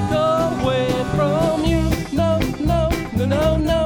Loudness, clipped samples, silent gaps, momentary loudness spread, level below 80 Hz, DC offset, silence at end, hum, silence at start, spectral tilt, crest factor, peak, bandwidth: -19 LUFS; under 0.1%; none; 2 LU; -28 dBFS; under 0.1%; 0 s; none; 0 s; -6.5 dB/octave; 14 dB; -4 dBFS; over 20 kHz